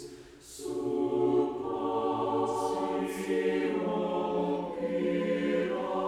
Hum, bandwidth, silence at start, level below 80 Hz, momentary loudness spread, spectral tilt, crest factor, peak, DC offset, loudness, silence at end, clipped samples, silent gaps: none; 15 kHz; 0 s; -64 dBFS; 6 LU; -6 dB/octave; 14 dB; -16 dBFS; under 0.1%; -31 LUFS; 0 s; under 0.1%; none